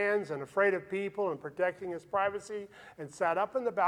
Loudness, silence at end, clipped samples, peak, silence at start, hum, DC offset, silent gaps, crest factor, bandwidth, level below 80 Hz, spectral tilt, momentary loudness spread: -33 LUFS; 0 s; under 0.1%; -14 dBFS; 0 s; none; under 0.1%; none; 18 dB; 11.5 kHz; -74 dBFS; -5.5 dB/octave; 13 LU